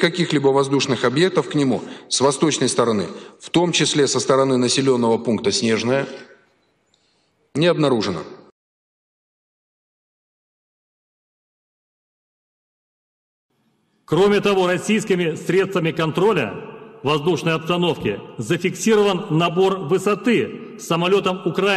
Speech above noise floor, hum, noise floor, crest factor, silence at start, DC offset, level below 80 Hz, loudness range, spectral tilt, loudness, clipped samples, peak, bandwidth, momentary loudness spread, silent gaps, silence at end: 46 dB; none; -65 dBFS; 16 dB; 0 s; under 0.1%; -60 dBFS; 6 LU; -4.5 dB/octave; -19 LUFS; under 0.1%; -6 dBFS; 13 kHz; 9 LU; 8.52-13.49 s; 0 s